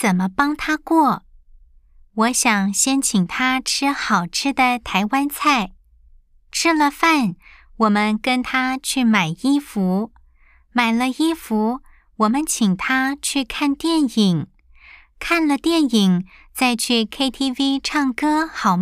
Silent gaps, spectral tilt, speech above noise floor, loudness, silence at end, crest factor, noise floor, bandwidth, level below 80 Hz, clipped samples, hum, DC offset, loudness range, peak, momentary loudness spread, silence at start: none; -3.5 dB/octave; 34 dB; -19 LUFS; 0 s; 18 dB; -53 dBFS; 15.5 kHz; -48 dBFS; under 0.1%; none; under 0.1%; 2 LU; -2 dBFS; 5 LU; 0 s